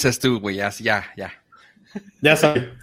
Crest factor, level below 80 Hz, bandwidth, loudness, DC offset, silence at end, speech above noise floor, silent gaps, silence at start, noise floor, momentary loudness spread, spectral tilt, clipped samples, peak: 20 dB; -54 dBFS; 16 kHz; -19 LUFS; under 0.1%; 0.05 s; 32 dB; none; 0 s; -53 dBFS; 22 LU; -4.5 dB/octave; under 0.1%; -2 dBFS